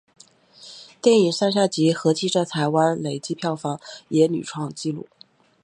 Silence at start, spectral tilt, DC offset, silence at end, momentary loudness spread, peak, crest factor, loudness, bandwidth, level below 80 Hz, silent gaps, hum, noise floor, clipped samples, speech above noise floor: 0.6 s; -5.5 dB/octave; under 0.1%; 0.65 s; 14 LU; -4 dBFS; 20 dB; -22 LUFS; 11 kHz; -70 dBFS; none; none; -54 dBFS; under 0.1%; 33 dB